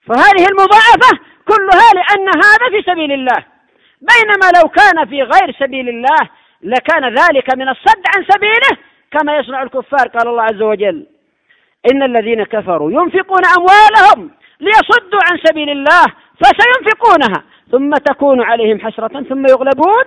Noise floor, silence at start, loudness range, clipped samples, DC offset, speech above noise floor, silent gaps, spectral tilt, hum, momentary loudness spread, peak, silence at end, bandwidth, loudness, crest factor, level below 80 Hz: -54 dBFS; 0.1 s; 6 LU; 3%; under 0.1%; 45 dB; none; -3.5 dB/octave; none; 11 LU; 0 dBFS; 0.05 s; 11 kHz; -9 LUFS; 10 dB; -46 dBFS